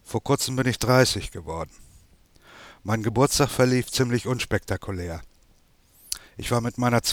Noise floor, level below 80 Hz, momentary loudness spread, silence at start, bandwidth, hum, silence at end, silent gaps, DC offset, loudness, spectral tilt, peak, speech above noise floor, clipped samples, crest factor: -59 dBFS; -46 dBFS; 14 LU; 0.1 s; 19.5 kHz; none; 0 s; none; under 0.1%; -24 LUFS; -4.5 dB/octave; -4 dBFS; 35 dB; under 0.1%; 20 dB